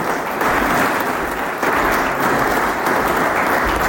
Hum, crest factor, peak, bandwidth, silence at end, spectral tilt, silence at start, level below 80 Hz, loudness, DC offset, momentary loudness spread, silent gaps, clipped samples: none; 12 dB; -6 dBFS; 17 kHz; 0 s; -4 dB/octave; 0 s; -36 dBFS; -17 LUFS; under 0.1%; 4 LU; none; under 0.1%